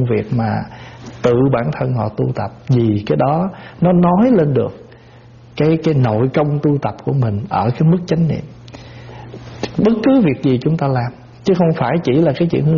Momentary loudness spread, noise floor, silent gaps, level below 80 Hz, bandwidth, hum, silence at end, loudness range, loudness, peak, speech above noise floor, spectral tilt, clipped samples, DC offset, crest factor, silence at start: 19 LU; -41 dBFS; none; -44 dBFS; 7 kHz; none; 0 s; 2 LU; -16 LUFS; -2 dBFS; 27 dB; -8 dB/octave; under 0.1%; under 0.1%; 12 dB; 0 s